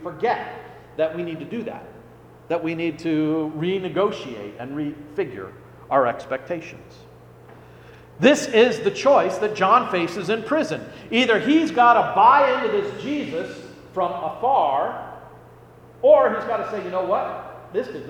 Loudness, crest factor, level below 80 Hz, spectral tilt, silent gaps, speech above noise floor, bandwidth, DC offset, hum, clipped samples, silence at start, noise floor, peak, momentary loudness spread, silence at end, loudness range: -21 LUFS; 20 dB; -60 dBFS; -5 dB/octave; none; 26 dB; 15.5 kHz; under 0.1%; none; under 0.1%; 0 s; -47 dBFS; -2 dBFS; 18 LU; 0 s; 8 LU